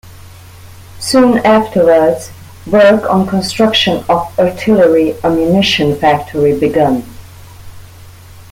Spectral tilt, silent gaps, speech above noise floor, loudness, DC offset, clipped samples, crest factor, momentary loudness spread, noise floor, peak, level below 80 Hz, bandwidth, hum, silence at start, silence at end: -5.5 dB/octave; none; 25 dB; -11 LUFS; under 0.1%; under 0.1%; 12 dB; 6 LU; -35 dBFS; 0 dBFS; -42 dBFS; 16.5 kHz; none; 0.05 s; 0.1 s